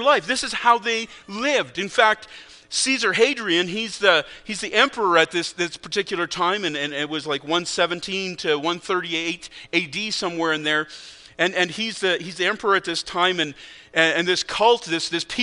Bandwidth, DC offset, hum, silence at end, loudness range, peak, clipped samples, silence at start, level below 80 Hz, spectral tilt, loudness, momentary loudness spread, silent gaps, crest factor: 10.5 kHz; under 0.1%; none; 0 s; 4 LU; 0 dBFS; under 0.1%; 0 s; -60 dBFS; -2.5 dB/octave; -21 LUFS; 8 LU; none; 22 dB